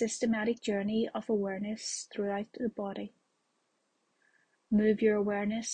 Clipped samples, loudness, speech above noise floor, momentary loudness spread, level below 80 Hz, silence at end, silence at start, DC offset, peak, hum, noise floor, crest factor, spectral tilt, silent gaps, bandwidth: under 0.1%; -32 LUFS; 46 dB; 9 LU; -68 dBFS; 0 s; 0 s; under 0.1%; -16 dBFS; none; -77 dBFS; 16 dB; -5 dB/octave; none; 9.6 kHz